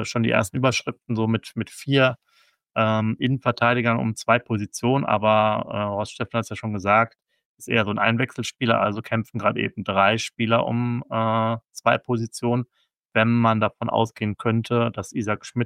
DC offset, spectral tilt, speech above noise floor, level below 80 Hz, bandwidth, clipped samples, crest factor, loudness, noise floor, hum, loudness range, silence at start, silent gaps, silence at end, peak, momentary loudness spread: under 0.1%; -5.5 dB/octave; 40 dB; -60 dBFS; 14.5 kHz; under 0.1%; 18 dB; -23 LUFS; -63 dBFS; none; 2 LU; 0 s; 7.45-7.55 s, 13.05-13.09 s; 0 s; -4 dBFS; 8 LU